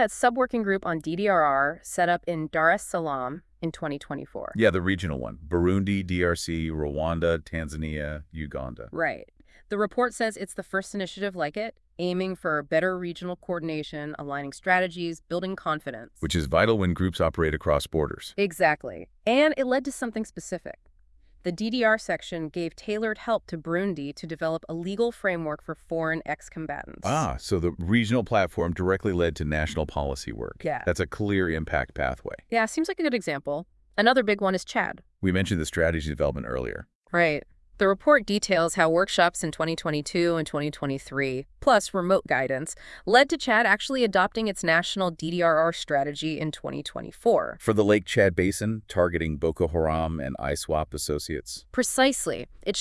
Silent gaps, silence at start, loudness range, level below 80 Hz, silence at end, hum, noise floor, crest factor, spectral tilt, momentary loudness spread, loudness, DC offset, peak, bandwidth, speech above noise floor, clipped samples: 36.95-37.02 s; 0 s; 6 LU; -46 dBFS; 0 s; none; -57 dBFS; 22 dB; -5 dB/octave; 12 LU; -26 LUFS; under 0.1%; -4 dBFS; 12 kHz; 31 dB; under 0.1%